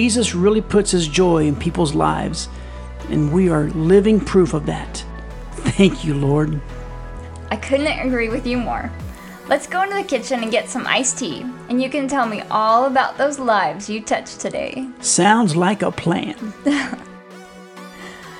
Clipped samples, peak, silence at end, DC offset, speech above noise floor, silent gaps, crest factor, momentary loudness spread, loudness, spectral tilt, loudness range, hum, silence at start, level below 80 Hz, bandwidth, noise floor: under 0.1%; 0 dBFS; 0 s; under 0.1%; 21 dB; none; 18 dB; 19 LU; -18 LUFS; -5 dB/octave; 4 LU; none; 0 s; -36 dBFS; 12.5 kHz; -39 dBFS